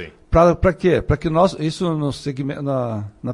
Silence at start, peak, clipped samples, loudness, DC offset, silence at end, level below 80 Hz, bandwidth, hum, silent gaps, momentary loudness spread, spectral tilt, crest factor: 0 s; -2 dBFS; under 0.1%; -19 LUFS; under 0.1%; 0 s; -32 dBFS; 11.5 kHz; none; none; 10 LU; -7.5 dB/octave; 16 dB